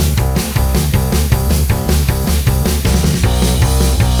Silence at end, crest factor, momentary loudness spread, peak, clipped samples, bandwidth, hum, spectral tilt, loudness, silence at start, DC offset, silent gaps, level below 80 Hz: 0 s; 12 dB; 2 LU; 0 dBFS; under 0.1%; over 20 kHz; none; -5 dB/octave; -14 LUFS; 0 s; under 0.1%; none; -16 dBFS